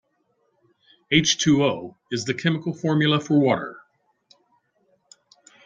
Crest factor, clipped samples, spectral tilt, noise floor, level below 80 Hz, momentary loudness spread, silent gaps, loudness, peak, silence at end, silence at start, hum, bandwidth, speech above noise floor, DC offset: 20 dB; under 0.1%; -4.5 dB/octave; -69 dBFS; -60 dBFS; 11 LU; none; -21 LUFS; -4 dBFS; 1.9 s; 1.1 s; none; 7.8 kHz; 48 dB; under 0.1%